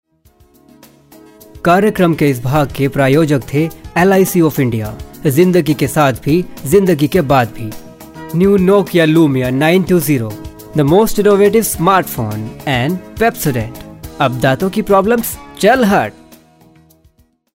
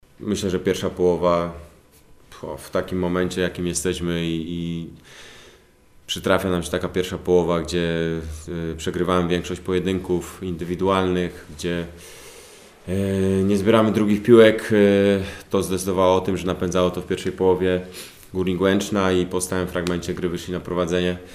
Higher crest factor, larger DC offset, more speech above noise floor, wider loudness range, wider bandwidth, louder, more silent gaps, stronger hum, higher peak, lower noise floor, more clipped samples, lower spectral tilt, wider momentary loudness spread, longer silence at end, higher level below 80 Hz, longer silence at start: second, 14 dB vs 22 dB; neither; first, 40 dB vs 31 dB; second, 3 LU vs 8 LU; about the same, 16.5 kHz vs 15.5 kHz; first, -13 LUFS vs -22 LUFS; neither; neither; about the same, 0 dBFS vs 0 dBFS; about the same, -52 dBFS vs -52 dBFS; neither; about the same, -6 dB/octave vs -5.5 dB/octave; about the same, 11 LU vs 13 LU; first, 1.45 s vs 0 s; first, -38 dBFS vs -46 dBFS; first, 1.55 s vs 0.2 s